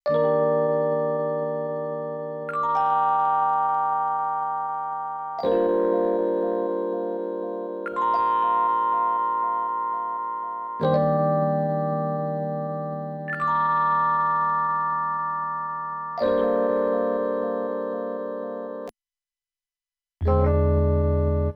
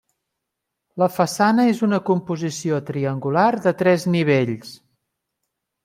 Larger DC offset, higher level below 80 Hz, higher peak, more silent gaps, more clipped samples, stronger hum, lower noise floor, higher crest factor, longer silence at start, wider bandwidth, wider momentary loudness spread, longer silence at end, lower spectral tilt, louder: neither; first, -38 dBFS vs -66 dBFS; second, -10 dBFS vs -4 dBFS; neither; neither; neither; first, under -90 dBFS vs -81 dBFS; about the same, 14 dB vs 18 dB; second, 0.05 s vs 0.95 s; second, 5.4 kHz vs 16 kHz; about the same, 9 LU vs 9 LU; second, 0 s vs 1.1 s; first, -10 dB/octave vs -6 dB/octave; second, -24 LUFS vs -20 LUFS